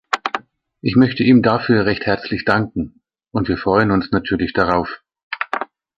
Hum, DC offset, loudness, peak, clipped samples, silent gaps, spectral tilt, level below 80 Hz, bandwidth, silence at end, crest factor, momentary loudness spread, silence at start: none; under 0.1%; -18 LUFS; 0 dBFS; under 0.1%; 5.23-5.31 s; -7.5 dB/octave; -42 dBFS; 7.6 kHz; 0.35 s; 18 dB; 13 LU; 0.1 s